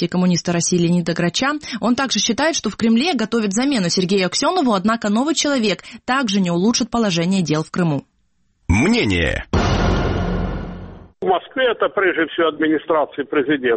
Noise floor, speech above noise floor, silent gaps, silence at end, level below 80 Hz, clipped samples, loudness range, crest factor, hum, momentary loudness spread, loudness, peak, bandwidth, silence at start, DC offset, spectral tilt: -65 dBFS; 47 dB; none; 0 s; -34 dBFS; under 0.1%; 2 LU; 14 dB; none; 5 LU; -18 LUFS; -4 dBFS; 8.8 kHz; 0 s; under 0.1%; -4.5 dB/octave